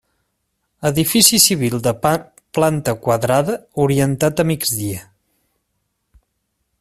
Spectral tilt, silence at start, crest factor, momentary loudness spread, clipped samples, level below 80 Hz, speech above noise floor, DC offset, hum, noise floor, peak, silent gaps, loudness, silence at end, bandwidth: -4 dB/octave; 0.8 s; 18 dB; 12 LU; under 0.1%; -50 dBFS; 55 dB; under 0.1%; none; -71 dBFS; 0 dBFS; none; -16 LUFS; 1.8 s; 16 kHz